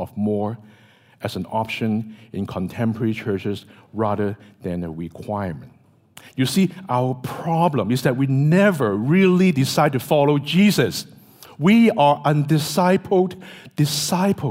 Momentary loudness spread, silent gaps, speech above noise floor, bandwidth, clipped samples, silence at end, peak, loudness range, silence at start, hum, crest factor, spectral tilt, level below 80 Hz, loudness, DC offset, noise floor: 15 LU; none; 33 dB; 16 kHz; under 0.1%; 0 s; -4 dBFS; 8 LU; 0 s; none; 16 dB; -6 dB/octave; -58 dBFS; -20 LUFS; under 0.1%; -52 dBFS